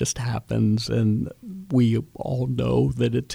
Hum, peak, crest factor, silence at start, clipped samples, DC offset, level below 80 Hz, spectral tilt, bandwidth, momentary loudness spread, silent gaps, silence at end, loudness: none; -10 dBFS; 14 dB; 0 s; under 0.1%; under 0.1%; -46 dBFS; -6.5 dB/octave; 13.5 kHz; 7 LU; none; 0 s; -24 LUFS